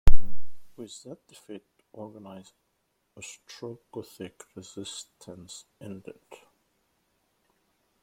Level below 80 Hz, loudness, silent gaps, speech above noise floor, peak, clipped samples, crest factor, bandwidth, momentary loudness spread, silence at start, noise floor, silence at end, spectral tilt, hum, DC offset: -34 dBFS; -42 LUFS; none; 32 dB; -2 dBFS; under 0.1%; 22 dB; 9 kHz; 14 LU; 0.05 s; -75 dBFS; 4 s; -5 dB/octave; none; under 0.1%